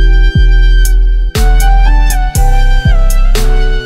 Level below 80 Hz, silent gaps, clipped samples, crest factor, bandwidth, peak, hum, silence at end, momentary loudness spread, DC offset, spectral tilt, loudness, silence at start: -6 dBFS; none; under 0.1%; 6 dB; 15 kHz; 0 dBFS; none; 0 s; 3 LU; under 0.1%; -4.5 dB/octave; -11 LUFS; 0 s